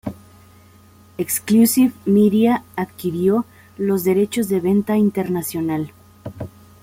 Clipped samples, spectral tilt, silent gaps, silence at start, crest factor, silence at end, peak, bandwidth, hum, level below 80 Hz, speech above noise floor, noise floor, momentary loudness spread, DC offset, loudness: under 0.1%; -6 dB/octave; none; 0.05 s; 14 dB; 0.35 s; -4 dBFS; 16.5 kHz; none; -58 dBFS; 31 dB; -48 dBFS; 19 LU; under 0.1%; -18 LUFS